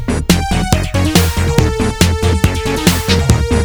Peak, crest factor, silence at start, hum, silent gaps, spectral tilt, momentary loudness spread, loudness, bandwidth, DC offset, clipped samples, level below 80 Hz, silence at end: 0 dBFS; 12 dB; 0 s; none; none; -5 dB/octave; 2 LU; -13 LUFS; over 20 kHz; under 0.1%; 0.2%; -20 dBFS; 0 s